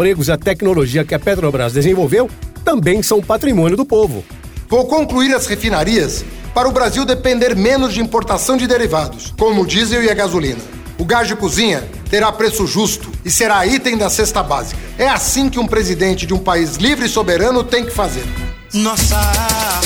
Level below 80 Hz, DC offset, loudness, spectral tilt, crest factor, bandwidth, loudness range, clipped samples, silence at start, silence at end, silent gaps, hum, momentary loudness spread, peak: -28 dBFS; under 0.1%; -14 LUFS; -4 dB/octave; 14 dB; over 20 kHz; 1 LU; under 0.1%; 0 s; 0 s; none; none; 7 LU; 0 dBFS